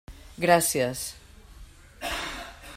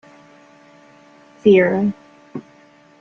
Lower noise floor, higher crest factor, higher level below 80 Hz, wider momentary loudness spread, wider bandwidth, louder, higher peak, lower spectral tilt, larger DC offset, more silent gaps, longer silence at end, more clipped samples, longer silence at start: about the same, -48 dBFS vs -50 dBFS; first, 24 dB vs 18 dB; first, -48 dBFS vs -62 dBFS; second, 16 LU vs 22 LU; first, 16 kHz vs 6.6 kHz; second, -26 LUFS vs -16 LUFS; second, -6 dBFS vs -2 dBFS; second, -3 dB/octave vs -8 dB/octave; neither; neither; second, 0 s vs 0.6 s; neither; second, 0.1 s vs 1.45 s